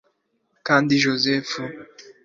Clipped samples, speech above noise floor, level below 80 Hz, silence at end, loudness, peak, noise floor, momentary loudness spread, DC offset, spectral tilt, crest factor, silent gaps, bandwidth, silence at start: under 0.1%; 48 dB; -64 dBFS; 0.25 s; -20 LUFS; -4 dBFS; -69 dBFS; 16 LU; under 0.1%; -4.5 dB/octave; 20 dB; none; 7.6 kHz; 0.65 s